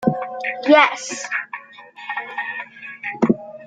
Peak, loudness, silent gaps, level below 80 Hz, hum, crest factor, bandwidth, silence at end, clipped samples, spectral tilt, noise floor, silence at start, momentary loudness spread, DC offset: 0 dBFS; -20 LUFS; none; -60 dBFS; none; 20 dB; 9.4 kHz; 0 s; under 0.1%; -4.5 dB/octave; -41 dBFS; 0 s; 20 LU; under 0.1%